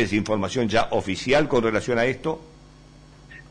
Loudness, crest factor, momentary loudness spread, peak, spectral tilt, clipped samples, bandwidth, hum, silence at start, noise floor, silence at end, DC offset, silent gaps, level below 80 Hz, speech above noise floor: -23 LUFS; 14 dB; 8 LU; -10 dBFS; -5.5 dB/octave; under 0.1%; 10.5 kHz; none; 0 s; -48 dBFS; 0.1 s; under 0.1%; none; -46 dBFS; 26 dB